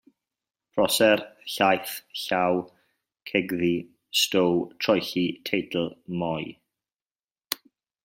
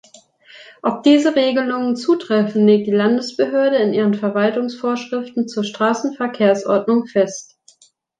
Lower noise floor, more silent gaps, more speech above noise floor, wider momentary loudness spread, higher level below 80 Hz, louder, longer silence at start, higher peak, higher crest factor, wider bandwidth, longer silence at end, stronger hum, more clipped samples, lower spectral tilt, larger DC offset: first, under -90 dBFS vs -55 dBFS; first, 7.24-7.28 s vs none; first, over 65 dB vs 38 dB; first, 12 LU vs 9 LU; about the same, -66 dBFS vs -68 dBFS; second, -25 LUFS vs -17 LUFS; first, 0.75 s vs 0.55 s; about the same, -2 dBFS vs -2 dBFS; first, 26 dB vs 16 dB; first, 16.5 kHz vs 9.2 kHz; second, 0.5 s vs 0.75 s; neither; neither; second, -4 dB/octave vs -5.5 dB/octave; neither